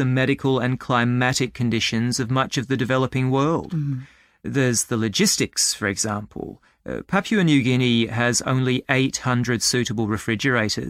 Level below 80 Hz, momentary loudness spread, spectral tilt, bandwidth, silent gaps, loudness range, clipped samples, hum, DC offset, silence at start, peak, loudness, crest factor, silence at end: -52 dBFS; 8 LU; -4.5 dB/octave; 15.5 kHz; none; 2 LU; under 0.1%; none; under 0.1%; 0 s; -2 dBFS; -21 LUFS; 20 dB; 0 s